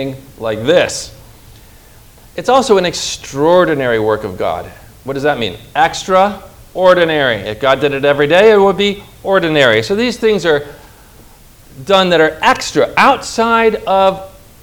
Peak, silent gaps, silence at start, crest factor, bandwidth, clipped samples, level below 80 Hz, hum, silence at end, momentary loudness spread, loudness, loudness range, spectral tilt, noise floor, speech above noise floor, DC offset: 0 dBFS; none; 0 s; 14 dB; over 20 kHz; 0.3%; -42 dBFS; none; 0.35 s; 14 LU; -12 LUFS; 4 LU; -4 dB/octave; -41 dBFS; 28 dB; under 0.1%